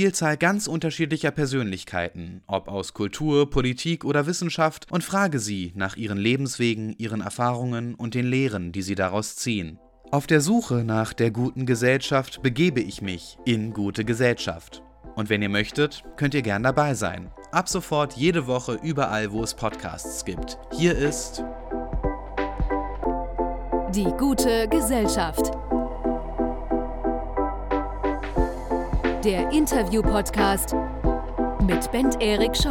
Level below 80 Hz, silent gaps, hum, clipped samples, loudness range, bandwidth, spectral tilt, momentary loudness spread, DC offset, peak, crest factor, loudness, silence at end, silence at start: -36 dBFS; none; none; under 0.1%; 4 LU; 17.5 kHz; -5 dB/octave; 8 LU; under 0.1%; -6 dBFS; 18 dB; -25 LUFS; 0 s; 0 s